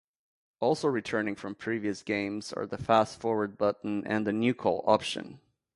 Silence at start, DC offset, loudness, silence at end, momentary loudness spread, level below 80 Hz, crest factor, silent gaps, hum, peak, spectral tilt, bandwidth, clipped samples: 0.6 s; under 0.1%; -30 LUFS; 0.4 s; 9 LU; -64 dBFS; 22 dB; none; none; -8 dBFS; -5.5 dB/octave; 11.5 kHz; under 0.1%